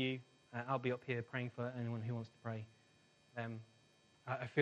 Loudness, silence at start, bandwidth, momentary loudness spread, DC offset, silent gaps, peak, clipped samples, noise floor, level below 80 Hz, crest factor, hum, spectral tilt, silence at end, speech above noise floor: -44 LUFS; 0 s; 8.4 kHz; 13 LU; under 0.1%; none; -20 dBFS; under 0.1%; -71 dBFS; -82 dBFS; 22 dB; none; -7.5 dB/octave; 0 s; 29 dB